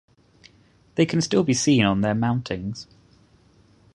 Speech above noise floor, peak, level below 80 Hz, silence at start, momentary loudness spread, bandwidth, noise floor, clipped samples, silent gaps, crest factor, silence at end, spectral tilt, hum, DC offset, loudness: 36 dB; -4 dBFS; -52 dBFS; 0.95 s; 13 LU; 11 kHz; -57 dBFS; under 0.1%; none; 20 dB; 1.1 s; -5 dB/octave; none; under 0.1%; -22 LUFS